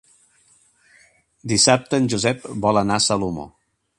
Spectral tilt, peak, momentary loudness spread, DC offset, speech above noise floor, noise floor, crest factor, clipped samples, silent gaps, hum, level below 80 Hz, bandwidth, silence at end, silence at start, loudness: -3.5 dB/octave; 0 dBFS; 16 LU; under 0.1%; 39 dB; -58 dBFS; 22 dB; under 0.1%; none; none; -52 dBFS; 11.5 kHz; 0.5 s; 1.45 s; -19 LUFS